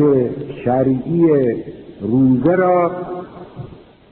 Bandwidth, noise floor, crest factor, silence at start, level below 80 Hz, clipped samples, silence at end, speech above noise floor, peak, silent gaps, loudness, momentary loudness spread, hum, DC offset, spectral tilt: 4.2 kHz; -38 dBFS; 14 dB; 0 s; -48 dBFS; under 0.1%; 0.35 s; 23 dB; -2 dBFS; none; -16 LUFS; 21 LU; none; under 0.1%; -9 dB/octave